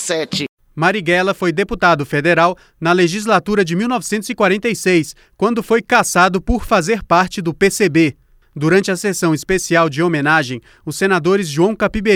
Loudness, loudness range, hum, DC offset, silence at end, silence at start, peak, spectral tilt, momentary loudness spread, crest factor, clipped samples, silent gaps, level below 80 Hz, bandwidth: -15 LUFS; 1 LU; none; under 0.1%; 0 s; 0 s; 0 dBFS; -4.5 dB/octave; 6 LU; 14 dB; under 0.1%; 0.49-0.57 s; -36 dBFS; 17 kHz